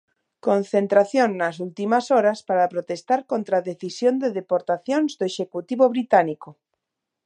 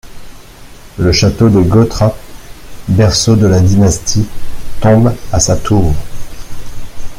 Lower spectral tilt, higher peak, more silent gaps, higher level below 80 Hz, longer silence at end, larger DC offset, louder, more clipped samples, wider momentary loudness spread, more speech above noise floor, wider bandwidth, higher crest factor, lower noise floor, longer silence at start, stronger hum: about the same, -5.5 dB/octave vs -5.5 dB/octave; about the same, -2 dBFS vs 0 dBFS; neither; second, -78 dBFS vs -26 dBFS; first, 0.75 s vs 0 s; neither; second, -22 LUFS vs -11 LUFS; neither; second, 10 LU vs 22 LU; first, 61 dB vs 24 dB; second, 9.8 kHz vs 15.5 kHz; first, 20 dB vs 10 dB; first, -83 dBFS vs -33 dBFS; first, 0.45 s vs 0.05 s; neither